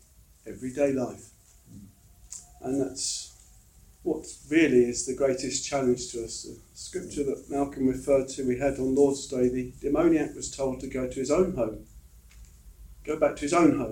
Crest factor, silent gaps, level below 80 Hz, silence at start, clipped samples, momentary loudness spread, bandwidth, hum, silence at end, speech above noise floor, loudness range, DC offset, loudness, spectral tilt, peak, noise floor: 20 dB; none; -50 dBFS; 0.45 s; under 0.1%; 15 LU; 16.5 kHz; none; 0 s; 28 dB; 6 LU; under 0.1%; -27 LUFS; -4.5 dB/octave; -8 dBFS; -55 dBFS